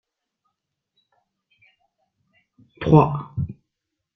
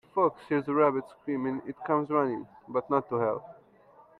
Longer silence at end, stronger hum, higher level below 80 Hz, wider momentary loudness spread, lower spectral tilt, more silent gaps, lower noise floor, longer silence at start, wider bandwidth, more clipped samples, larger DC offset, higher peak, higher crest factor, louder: about the same, 0.65 s vs 0.7 s; neither; first, -50 dBFS vs -72 dBFS; first, 15 LU vs 10 LU; about the same, -10 dB/octave vs -9.5 dB/octave; neither; first, -81 dBFS vs -58 dBFS; first, 2.8 s vs 0.15 s; first, 6 kHz vs 4.6 kHz; neither; neither; first, -2 dBFS vs -10 dBFS; first, 24 dB vs 18 dB; first, -20 LUFS vs -29 LUFS